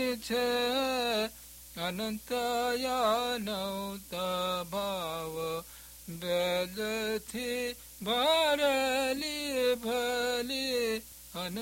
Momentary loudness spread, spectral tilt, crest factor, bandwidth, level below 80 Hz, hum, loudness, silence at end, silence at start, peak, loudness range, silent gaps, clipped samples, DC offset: 11 LU; -3 dB/octave; 16 dB; 16.5 kHz; -60 dBFS; none; -31 LUFS; 0 s; 0 s; -16 dBFS; 5 LU; none; under 0.1%; under 0.1%